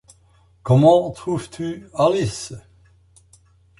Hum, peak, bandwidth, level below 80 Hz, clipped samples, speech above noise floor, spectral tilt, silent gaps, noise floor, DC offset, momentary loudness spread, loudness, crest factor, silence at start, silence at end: none; -2 dBFS; 11.5 kHz; -52 dBFS; under 0.1%; 37 dB; -7 dB/octave; none; -55 dBFS; under 0.1%; 21 LU; -19 LUFS; 18 dB; 0.65 s; 1.2 s